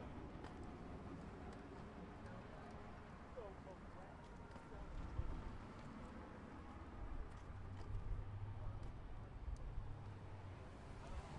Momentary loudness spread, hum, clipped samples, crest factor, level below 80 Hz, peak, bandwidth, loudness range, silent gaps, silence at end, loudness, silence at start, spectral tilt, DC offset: 6 LU; none; under 0.1%; 20 dB; -54 dBFS; -32 dBFS; 11 kHz; 3 LU; none; 0 s; -54 LUFS; 0 s; -7.5 dB/octave; under 0.1%